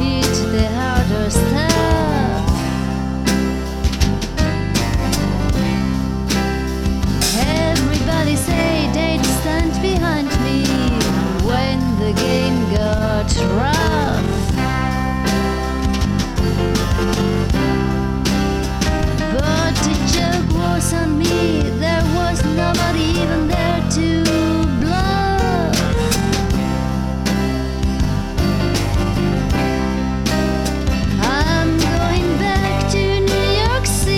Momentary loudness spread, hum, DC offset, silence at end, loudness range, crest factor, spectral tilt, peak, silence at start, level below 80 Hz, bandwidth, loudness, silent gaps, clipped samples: 3 LU; none; 0.1%; 0 s; 2 LU; 16 dB; -5.5 dB/octave; 0 dBFS; 0 s; -24 dBFS; 17 kHz; -17 LUFS; none; under 0.1%